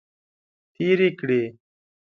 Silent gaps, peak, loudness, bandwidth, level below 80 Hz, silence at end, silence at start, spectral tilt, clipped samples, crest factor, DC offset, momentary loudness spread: none; -8 dBFS; -23 LUFS; 6 kHz; -72 dBFS; 0.65 s; 0.8 s; -8 dB/octave; under 0.1%; 18 dB; under 0.1%; 8 LU